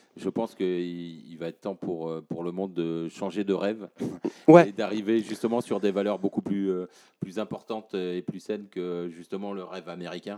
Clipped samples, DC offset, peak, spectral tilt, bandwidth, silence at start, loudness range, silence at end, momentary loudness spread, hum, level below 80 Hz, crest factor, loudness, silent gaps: under 0.1%; under 0.1%; -2 dBFS; -7 dB/octave; 12 kHz; 0.15 s; 10 LU; 0 s; 11 LU; none; -76 dBFS; 26 dB; -28 LUFS; none